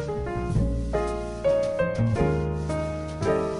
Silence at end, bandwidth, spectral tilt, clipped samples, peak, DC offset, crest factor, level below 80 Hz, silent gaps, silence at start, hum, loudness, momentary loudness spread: 0 s; 11 kHz; -7.5 dB/octave; under 0.1%; -10 dBFS; under 0.1%; 16 dB; -34 dBFS; none; 0 s; none; -26 LUFS; 6 LU